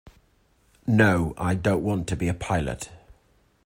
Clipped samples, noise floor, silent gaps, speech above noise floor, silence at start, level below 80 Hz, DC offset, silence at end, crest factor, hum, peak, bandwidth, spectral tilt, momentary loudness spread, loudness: under 0.1%; -63 dBFS; none; 40 dB; 0.85 s; -46 dBFS; under 0.1%; 0.7 s; 20 dB; none; -6 dBFS; 16 kHz; -6.5 dB/octave; 15 LU; -24 LUFS